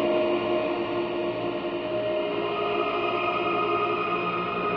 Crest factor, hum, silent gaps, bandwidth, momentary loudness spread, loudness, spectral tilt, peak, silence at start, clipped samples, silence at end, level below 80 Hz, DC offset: 14 dB; none; none; 6 kHz; 4 LU; -26 LUFS; -7.5 dB/octave; -12 dBFS; 0 s; under 0.1%; 0 s; -58 dBFS; under 0.1%